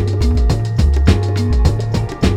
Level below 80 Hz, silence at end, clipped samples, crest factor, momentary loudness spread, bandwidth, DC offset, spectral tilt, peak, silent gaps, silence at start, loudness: -16 dBFS; 0 s; under 0.1%; 14 dB; 3 LU; 11.5 kHz; under 0.1%; -7 dB/octave; 0 dBFS; none; 0 s; -16 LUFS